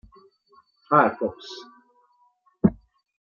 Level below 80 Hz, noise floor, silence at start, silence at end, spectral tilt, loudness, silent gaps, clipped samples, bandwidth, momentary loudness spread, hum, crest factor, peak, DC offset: -54 dBFS; -64 dBFS; 0.9 s; 0.55 s; -7.5 dB/octave; -23 LUFS; none; under 0.1%; 7.2 kHz; 20 LU; none; 24 dB; -4 dBFS; under 0.1%